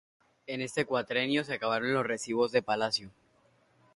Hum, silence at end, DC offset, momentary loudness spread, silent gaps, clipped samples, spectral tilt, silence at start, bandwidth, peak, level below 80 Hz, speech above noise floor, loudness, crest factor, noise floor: none; 0.85 s; under 0.1%; 6 LU; none; under 0.1%; -4 dB/octave; 0.5 s; 11.5 kHz; -12 dBFS; -72 dBFS; 36 dB; -31 LUFS; 20 dB; -67 dBFS